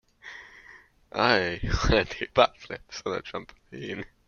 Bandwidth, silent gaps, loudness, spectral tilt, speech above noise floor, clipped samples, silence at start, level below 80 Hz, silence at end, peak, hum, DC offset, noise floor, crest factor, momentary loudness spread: 7.2 kHz; none; -26 LUFS; -5 dB/octave; 26 dB; under 0.1%; 0.25 s; -40 dBFS; 0.2 s; -4 dBFS; none; under 0.1%; -53 dBFS; 24 dB; 21 LU